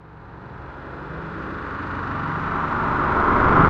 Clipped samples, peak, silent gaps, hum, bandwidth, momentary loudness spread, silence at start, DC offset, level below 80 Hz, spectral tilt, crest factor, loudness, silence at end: under 0.1%; -2 dBFS; none; none; 7 kHz; 20 LU; 0 s; under 0.1%; -36 dBFS; -8.5 dB/octave; 20 dB; -23 LUFS; 0 s